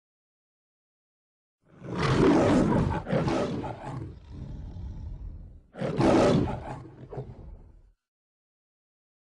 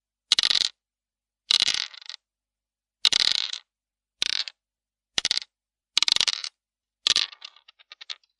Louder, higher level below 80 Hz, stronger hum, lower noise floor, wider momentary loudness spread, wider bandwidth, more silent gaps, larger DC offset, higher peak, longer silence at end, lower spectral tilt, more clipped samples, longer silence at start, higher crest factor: second, -26 LUFS vs -23 LUFS; first, -44 dBFS vs -66 dBFS; neither; second, -54 dBFS vs under -90 dBFS; first, 22 LU vs 18 LU; about the same, 10.5 kHz vs 11.5 kHz; neither; neither; second, -10 dBFS vs -4 dBFS; first, 1.55 s vs 0.25 s; first, -7 dB/octave vs 2 dB/octave; neither; first, 1.8 s vs 0.3 s; second, 18 dB vs 24 dB